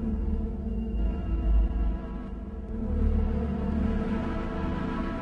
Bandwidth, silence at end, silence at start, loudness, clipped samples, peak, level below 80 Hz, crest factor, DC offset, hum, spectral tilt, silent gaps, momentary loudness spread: 5 kHz; 0 s; 0 s; -31 LUFS; under 0.1%; -14 dBFS; -30 dBFS; 14 dB; under 0.1%; none; -9.5 dB/octave; none; 8 LU